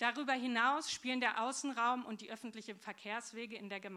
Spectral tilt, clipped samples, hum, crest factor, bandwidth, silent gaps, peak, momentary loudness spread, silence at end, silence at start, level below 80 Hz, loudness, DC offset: -2 dB/octave; under 0.1%; none; 20 dB; 14 kHz; none; -20 dBFS; 14 LU; 0 s; 0 s; -86 dBFS; -38 LUFS; under 0.1%